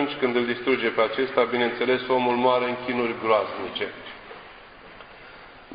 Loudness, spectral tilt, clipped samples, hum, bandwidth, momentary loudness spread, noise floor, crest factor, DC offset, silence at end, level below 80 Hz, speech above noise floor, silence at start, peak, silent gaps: -24 LUFS; -9 dB/octave; under 0.1%; none; 5.2 kHz; 22 LU; -46 dBFS; 20 dB; under 0.1%; 0 s; -60 dBFS; 22 dB; 0 s; -6 dBFS; none